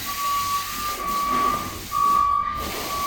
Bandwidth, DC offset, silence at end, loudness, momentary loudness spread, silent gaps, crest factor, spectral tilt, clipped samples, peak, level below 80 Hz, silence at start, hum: 17.5 kHz; under 0.1%; 0 s; -23 LUFS; 8 LU; none; 14 dB; -2 dB/octave; under 0.1%; -10 dBFS; -44 dBFS; 0 s; none